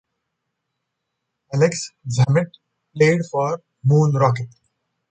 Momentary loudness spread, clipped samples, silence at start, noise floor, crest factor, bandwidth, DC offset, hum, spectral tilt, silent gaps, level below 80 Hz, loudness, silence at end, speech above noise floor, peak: 12 LU; under 0.1%; 1.5 s; -78 dBFS; 18 dB; 9 kHz; under 0.1%; none; -6.5 dB/octave; none; -58 dBFS; -19 LUFS; 0.65 s; 60 dB; -2 dBFS